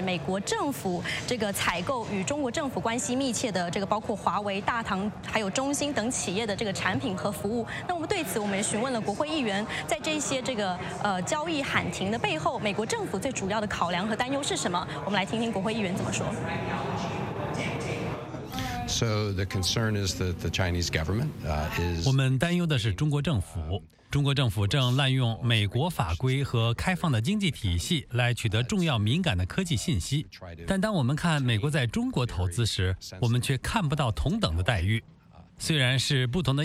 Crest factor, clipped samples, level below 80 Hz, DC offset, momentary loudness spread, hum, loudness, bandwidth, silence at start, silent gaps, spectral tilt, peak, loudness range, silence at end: 20 dB; under 0.1%; -46 dBFS; under 0.1%; 6 LU; none; -28 LUFS; 16 kHz; 0 s; none; -5 dB/octave; -8 dBFS; 3 LU; 0 s